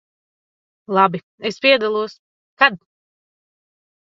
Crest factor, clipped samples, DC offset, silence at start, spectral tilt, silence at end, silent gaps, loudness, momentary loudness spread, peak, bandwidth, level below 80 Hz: 22 dB; under 0.1%; under 0.1%; 0.9 s; -5 dB/octave; 1.3 s; 1.23-1.38 s, 2.19-2.57 s; -17 LUFS; 12 LU; 0 dBFS; 7.6 kHz; -70 dBFS